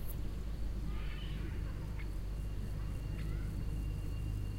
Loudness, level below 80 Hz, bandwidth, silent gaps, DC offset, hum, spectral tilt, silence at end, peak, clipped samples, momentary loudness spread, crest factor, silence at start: -42 LUFS; -40 dBFS; 16 kHz; none; under 0.1%; none; -6.5 dB/octave; 0 s; -28 dBFS; under 0.1%; 2 LU; 12 dB; 0 s